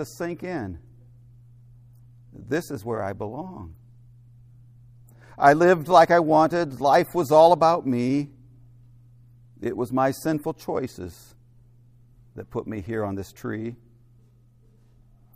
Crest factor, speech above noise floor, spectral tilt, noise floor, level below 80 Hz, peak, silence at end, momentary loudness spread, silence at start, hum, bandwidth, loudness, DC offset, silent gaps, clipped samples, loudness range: 24 dB; 34 dB; -6.5 dB/octave; -56 dBFS; -58 dBFS; -2 dBFS; 1.6 s; 20 LU; 0 s; none; 15.5 kHz; -22 LUFS; under 0.1%; none; under 0.1%; 16 LU